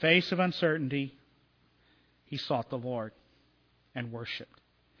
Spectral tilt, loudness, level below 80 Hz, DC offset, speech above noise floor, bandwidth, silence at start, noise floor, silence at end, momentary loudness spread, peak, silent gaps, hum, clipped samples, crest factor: -6.5 dB/octave; -32 LUFS; -72 dBFS; under 0.1%; 38 dB; 5.4 kHz; 0 s; -68 dBFS; 0.55 s; 15 LU; -10 dBFS; none; 60 Hz at -60 dBFS; under 0.1%; 24 dB